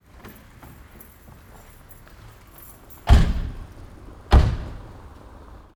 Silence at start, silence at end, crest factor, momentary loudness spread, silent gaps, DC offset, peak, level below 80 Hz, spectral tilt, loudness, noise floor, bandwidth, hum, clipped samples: 0.25 s; 0.9 s; 22 dB; 27 LU; none; under 0.1%; -2 dBFS; -26 dBFS; -6.5 dB/octave; -21 LUFS; -47 dBFS; 18.5 kHz; none; under 0.1%